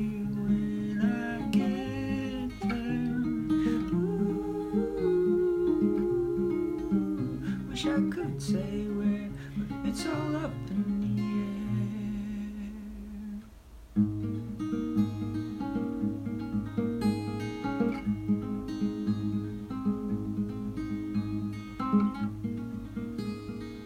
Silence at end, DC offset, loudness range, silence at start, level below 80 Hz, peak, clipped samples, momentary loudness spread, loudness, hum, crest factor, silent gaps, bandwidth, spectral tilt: 0 s; under 0.1%; 5 LU; 0 s; -50 dBFS; -14 dBFS; under 0.1%; 9 LU; -31 LUFS; none; 16 dB; none; 13 kHz; -7.5 dB/octave